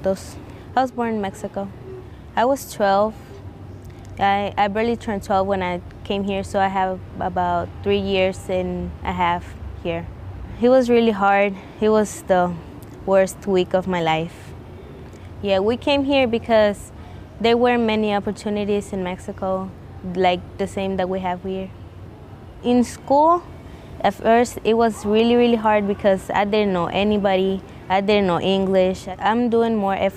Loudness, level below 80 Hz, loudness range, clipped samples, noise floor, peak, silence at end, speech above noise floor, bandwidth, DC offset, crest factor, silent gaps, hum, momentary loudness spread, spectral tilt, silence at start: -20 LUFS; -44 dBFS; 5 LU; under 0.1%; -39 dBFS; -6 dBFS; 0 s; 20 dB; 15 kHz; under 0.1%; 14 dB; none; none; 20 LU; -6 dB/octave; 0 s